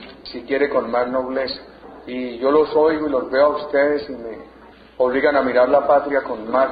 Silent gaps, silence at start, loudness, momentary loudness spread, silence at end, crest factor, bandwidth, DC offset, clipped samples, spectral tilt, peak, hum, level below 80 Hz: none; 0 s; -19 LUFS; 16 LU; 0 s; 14 dB; 5 kHz; under 0.1%; under 0.1%; -8 dB/octave; -4 dBFS; none; -52 dBFS